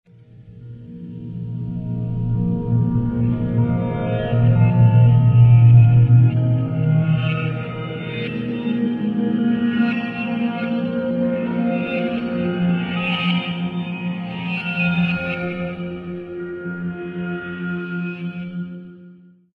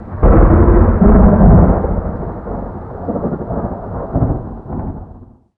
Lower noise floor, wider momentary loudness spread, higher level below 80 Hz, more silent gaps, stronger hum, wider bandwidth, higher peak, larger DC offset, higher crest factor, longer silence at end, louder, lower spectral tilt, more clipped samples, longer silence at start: first, -46 dBFS vs -38 dBFS; about the same, 16 LU vs 17 LU; second, -42 dBFS vs -16 dBFS; neither; neither; first, 4.4 kHz vs 2.6 kHz; about the same, -2 dBFS vs 0 dBFS; neither; about the same, 16 dB vs 12 dB; about the same, 0.4 s vs 0.35 s; second, -19 LUFS vs -13 LUFS; second, -10.5 dB/octave vs -14.5 dB/octave; neither; first, 0.35 s vs 0 s